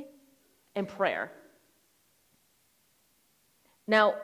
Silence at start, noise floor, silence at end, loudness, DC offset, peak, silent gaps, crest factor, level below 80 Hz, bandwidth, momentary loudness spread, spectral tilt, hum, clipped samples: 0 s; -69 dBFS; 0 s; -30 LUFS; under 0.1%; -8 dBFS; none; 24 dB; -78 dBFS; 16 kHz; 21 LU; -5 dB/octave; none; under 0.1%